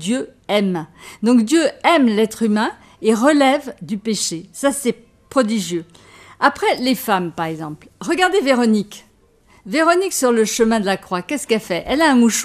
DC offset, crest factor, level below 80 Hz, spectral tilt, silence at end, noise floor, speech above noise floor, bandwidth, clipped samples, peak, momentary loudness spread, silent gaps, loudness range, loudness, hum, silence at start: under 0.1%; 18 dB; -54 dBFS; -4 dB/octave; 0 s; -53 dBFS; 36 dB; 15.5 kHz; under 0.1%; 0 dBFS; 11 LU; none; 4 LU; -18 LUFS; none; 0 s